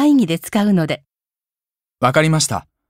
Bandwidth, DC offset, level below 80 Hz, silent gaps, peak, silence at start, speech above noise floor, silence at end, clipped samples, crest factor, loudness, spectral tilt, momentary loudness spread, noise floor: 16 kHz; under 0.1%; -56 dBFS; none; -2 dBFS; 0 s; over 74 dB; 0.3 s; under 0.1%; 16 dB; -17 LUFS; -5 dB/octave; 7 LU; under -90 dBFS